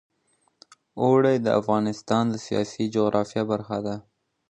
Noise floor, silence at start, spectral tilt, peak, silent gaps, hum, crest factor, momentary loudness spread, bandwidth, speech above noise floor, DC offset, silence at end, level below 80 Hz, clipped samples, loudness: -68 dBFS; 0.95 s; -6.5 dB/octave; -6 dBFS; none; none; 18 dB; 10 LU; 9.4 kHz; 45 dB; under 0.1%; 0.5 s; -62 dBFS; under 0.1%; -24 LUFS